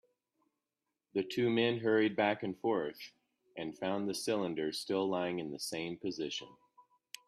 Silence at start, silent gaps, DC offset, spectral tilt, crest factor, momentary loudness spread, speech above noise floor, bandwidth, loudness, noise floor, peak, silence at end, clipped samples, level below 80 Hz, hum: 1.15 s; none; under 0.1%; -4.5 dB/octave; 20 dB; 13 LU; 55 dB; 14 kHz; -35 LUFS; -89 dBFS; -16 dBFS; 0.45 s; under 0.1%; -78 dBFS; none